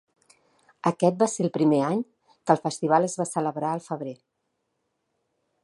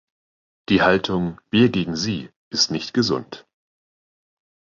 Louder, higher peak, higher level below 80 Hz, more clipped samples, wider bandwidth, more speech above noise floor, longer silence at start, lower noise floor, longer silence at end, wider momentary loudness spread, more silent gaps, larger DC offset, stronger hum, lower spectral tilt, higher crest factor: second, -25 LUFS vs -21 LUFS; about the same, -4 dBFS vs -2 dBFS; second, -76 dBFS vs -52 dBFS; neither; first, 11.5 kHz vs 7.6 kHz; second, 53 dB vs over 70 dB; first, 0.85 s vs 0.7 s; second, -77 dBFS vs under -90 dBFS; first, 1.5 s vs 1.35 s; about the same, 12 LU vs 11 LU; second, none vs 2.36-2.51 s; neither; neither; first, -6 dB/octave vs -4.5 dB/octave; about the same, 22 dB vs 22 dB